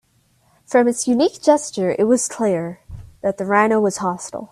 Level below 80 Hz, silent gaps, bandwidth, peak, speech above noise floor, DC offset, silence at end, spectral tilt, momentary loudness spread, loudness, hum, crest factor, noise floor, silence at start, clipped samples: -52 dBFS; none; 13.5 kHz; -2 dBFS; 42 dB; under 0.1%; 0.05 s; -4.5 dB/octave; 9 LU; -18 LUFS; none; 18 dB; -60 dBFS; 0.7 s; under 0.1%